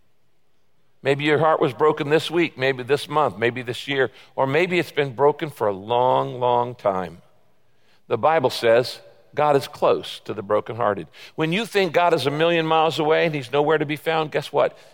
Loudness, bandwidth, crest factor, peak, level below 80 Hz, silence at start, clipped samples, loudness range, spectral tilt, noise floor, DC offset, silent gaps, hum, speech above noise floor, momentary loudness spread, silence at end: -21 LUFS; 17 kHz; 16 dB; -6 dBFS; -66 dBFS; 1.05 s; under 0.1%; 3 LU; -5.5 dB/octave; -69 dBFS; 0.2%; none; none; 48 dB; 7 LU; 0.2 s